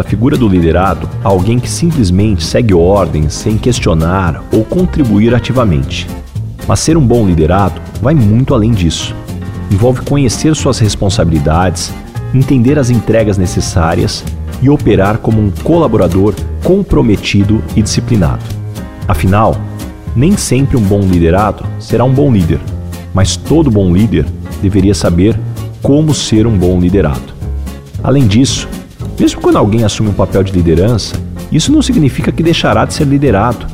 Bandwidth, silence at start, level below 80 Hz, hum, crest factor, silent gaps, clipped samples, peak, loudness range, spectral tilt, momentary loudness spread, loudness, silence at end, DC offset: 16 kHz; 0 s; -24 dBFS; none; 10 dB; none; under 0.1%; 0 dBFS; 1 LU; -6.5 dB/octave; 10 LU; -11 LUFS; 0 s; 2%